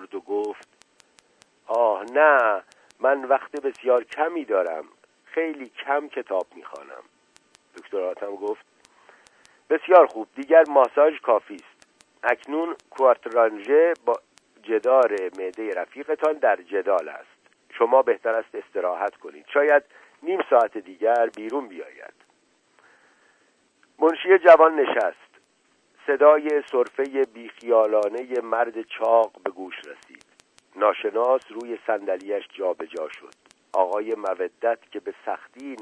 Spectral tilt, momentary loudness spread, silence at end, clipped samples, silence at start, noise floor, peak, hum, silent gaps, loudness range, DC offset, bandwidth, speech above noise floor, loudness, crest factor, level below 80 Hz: -4 dB/octave; 18 LU; 0 s; under 0.1%; 0 s; -65 dBFS; -2 dBFS; none; none; 9 LU; under 0.1%; 9.8 kHz; 43 dB; -22 LUFS; 22 dB; -80 dBFS